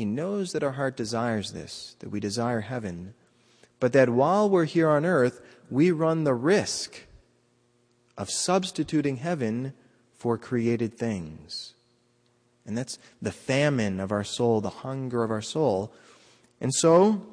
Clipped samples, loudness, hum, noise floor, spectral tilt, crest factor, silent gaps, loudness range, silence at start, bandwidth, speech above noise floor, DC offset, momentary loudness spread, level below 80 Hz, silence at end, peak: under 0.1%; -26 LUFS; none; -66 dBFS; -5.5 dB/octave; 20 dB; none; 8 LU; 0 s; 10.5 kHz; 41 dB; under 0.1%; 16 LU; -64 dBFS; 0 s; -8 dBFS